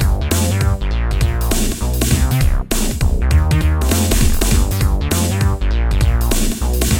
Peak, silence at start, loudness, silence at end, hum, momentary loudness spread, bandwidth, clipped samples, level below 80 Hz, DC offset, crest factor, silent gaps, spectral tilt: 0 dBFS; 0 s; -17 LUFS; 0 s; none; 3 LU; 19 kHz; under 0.1%; -16 dBFS; under 0.1%; 14 dB; none; -5 dB/octave